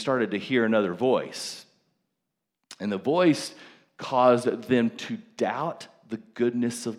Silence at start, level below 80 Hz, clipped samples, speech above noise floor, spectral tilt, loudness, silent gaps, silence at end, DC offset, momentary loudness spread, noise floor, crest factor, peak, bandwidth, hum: 0 s; -76 dBFS; under 0.1%; 58 dB; -5.5 dB/octave; -26 LUFS; none; 0 s; under 0.1%; 16 LU; -83 dBFS; 18 dB; -8 dBFS; 13.5 kHz; none